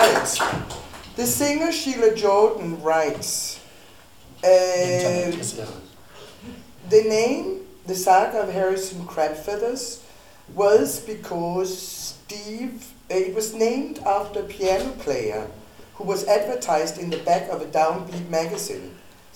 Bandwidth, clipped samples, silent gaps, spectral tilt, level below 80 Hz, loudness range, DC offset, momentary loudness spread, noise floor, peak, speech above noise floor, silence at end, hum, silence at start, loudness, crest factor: 19 kHz; under 0.1%; none; -3.5 dB/octave; -54 dBFS; 4 LU; 0.3%; 17 LU; -49 dBFS; -2 dBFS; 27 dB; 0.2 s; none; 0 s; -23 LUFS; 20 dB